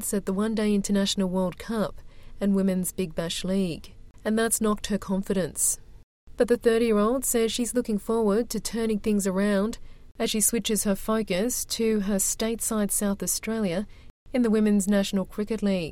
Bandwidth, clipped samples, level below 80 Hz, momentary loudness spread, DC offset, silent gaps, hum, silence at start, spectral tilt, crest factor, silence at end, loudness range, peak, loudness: 16.5 kHz; under 0.1%; -46 dBFS; 7 LU; under 0.1%; 6.03-6.27 s, 14.10-14.26 s; none; 0 s; -4.5 dB/octave; 18 dB; 0 s; 3 LU; -8 dBFS; -26 LUFS